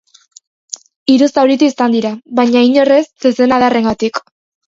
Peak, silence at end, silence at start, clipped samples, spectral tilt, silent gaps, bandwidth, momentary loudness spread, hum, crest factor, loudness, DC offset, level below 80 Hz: 0 dBFS; 0.5 s; 1.1 s; under 0.1%; -4.5 dB/octave; none; 7.8 kHz; 12 LU; none; 12 dB; -12 LUFS; under 0.1%; -52 dBFS